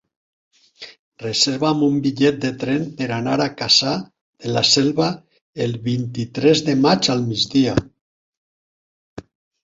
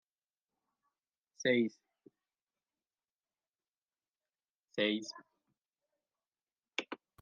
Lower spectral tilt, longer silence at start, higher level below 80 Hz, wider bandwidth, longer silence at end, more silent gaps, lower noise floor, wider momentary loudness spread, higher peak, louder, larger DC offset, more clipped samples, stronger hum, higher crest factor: about the same, -4.5 dB/octave vs -4 dB/octave; second, 0.8 s vs 1.4 s; first, -52 dBFS vs under -90 dBFS; second, 8 kHz vs 9 kHz; first, 0.45 s vs 0.25 s; first, 0.99-1.12 s, 4.21-4.33 s, 5.41-5.53 s, 8.01-9.17 s vs 2.42-2.47 s, 3.12-3.19 s, 3.49-3.53 s, 3.69-3.73 s, 3.85-3.89 s, 4.50-4.60 s, 6.43-6.47 s; about the same, under -90 dBFS vs under -90 dBFS; about the same, 16 LU vs 17 LU; first, -2 dBFS vs -18 dBFS; first, -18 LUFS vs -36 LUFS; neither; neither; neither; second, 18 dB vs 24 dB